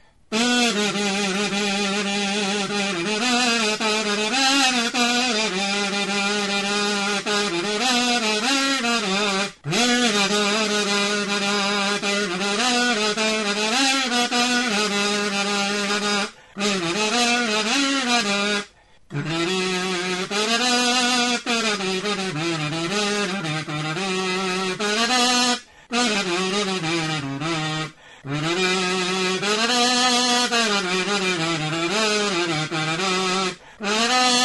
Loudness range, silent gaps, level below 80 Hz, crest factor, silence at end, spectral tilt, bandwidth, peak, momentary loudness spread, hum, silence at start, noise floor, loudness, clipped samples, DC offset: 3 LU; none; -62 dBFS; 16 dB; 0 s; -2.5 dB/octave; 11.5 kHz; -6 dBFS; 6 LU; none; 0.3 s; -47 dBFS; -20 LUFS; under 0.1%; 0.1%